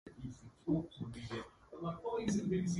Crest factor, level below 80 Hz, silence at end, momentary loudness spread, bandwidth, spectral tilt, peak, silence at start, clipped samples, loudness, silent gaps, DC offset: 18 dB; -62 dBFS; 0 s; 14 LU; 11.5 kHz; -6.5 dB/octave; -22 dBFS; 0.05 s; under 0.1%; -41 LUFS; none; under 0.1%